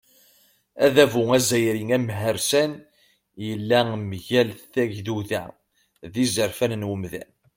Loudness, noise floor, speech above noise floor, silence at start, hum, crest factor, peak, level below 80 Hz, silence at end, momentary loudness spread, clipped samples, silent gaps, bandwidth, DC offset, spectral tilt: -23 LUFS; -60 dBFS; 38 dB; 0.75 s; none; 22 dB; -2 dBFS; -60 dBFS; 0.35 s; 14 LU; under 0.1%; none; 16.5 kHz; under 0.1%; -4.5 dB/octave